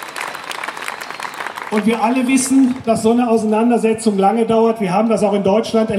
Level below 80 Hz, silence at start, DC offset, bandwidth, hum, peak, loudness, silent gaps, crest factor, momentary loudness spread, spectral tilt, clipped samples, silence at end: -56 dBFS; 0 s; under 0.1%; 15.5 kHz; none; -2 dBFS; -16 LUFS; none; 14 dB; 11 LU; -5 dB/octave; under 0.1%; 0 s